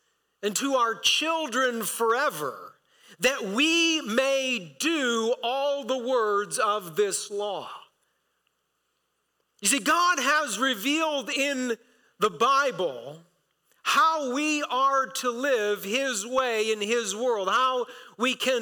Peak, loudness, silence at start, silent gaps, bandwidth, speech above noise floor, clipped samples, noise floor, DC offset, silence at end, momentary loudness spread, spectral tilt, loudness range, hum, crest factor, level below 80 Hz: -12 dBFS; -25 LUFS; 0.4 s; none; 19 kHz; 50 dB; under 0.1%; -76 dBFS; under 0.1%; 0 s; 10 LU; -1.5 dB/octave; 4 LU; none; 14 dB; -74 dBFS